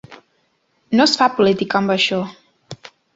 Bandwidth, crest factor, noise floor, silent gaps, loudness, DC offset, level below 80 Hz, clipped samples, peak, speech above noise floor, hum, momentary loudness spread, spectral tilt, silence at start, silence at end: 8 kHz; 18 dB; -64 dBFS; none; -16 LUFS; under 0.1%; -60 dBFS; under 0.1%; -2 dBFS; 48 dB; none; 23 LU; -4.5 dB/octave; 0.1 s; 0.4 s